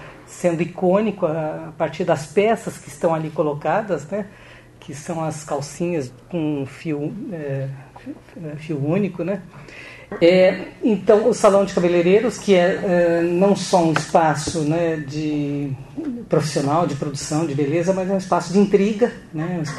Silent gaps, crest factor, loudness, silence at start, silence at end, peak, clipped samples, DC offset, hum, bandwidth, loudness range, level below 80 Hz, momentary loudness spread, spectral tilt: none; 18 dB; -20 LUFS; 0 s; 0 s; -2 dBFS; under 0.1%; under 0.1%; none; 12.5 kHz; 10 LU; -52 dBFS; 14 LU; -6 dB/octave